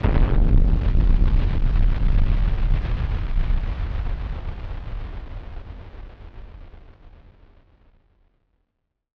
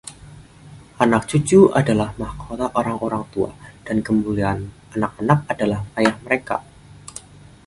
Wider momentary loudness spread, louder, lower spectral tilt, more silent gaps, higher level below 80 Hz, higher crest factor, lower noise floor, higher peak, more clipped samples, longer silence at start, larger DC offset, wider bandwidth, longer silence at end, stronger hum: first, 22 LU vs 19 LU; second, -25 LUFS vs -20 LUFS; first, -9.5 dB/octave vs -6.5 dB/octave; neither; first, -22 dBFS vs -44 dBFS; about the same, 16 dB vs 20 dB; first, -77 dBFS vs -43 dBFS; second, -4 dBFS vs 0 dBFS; neither; about the same, 0.05 s vs 0.05 s; neither; second, 4.6 kHz vs 11.5 kHz; first, 2.05 s vs 0.45 s; neither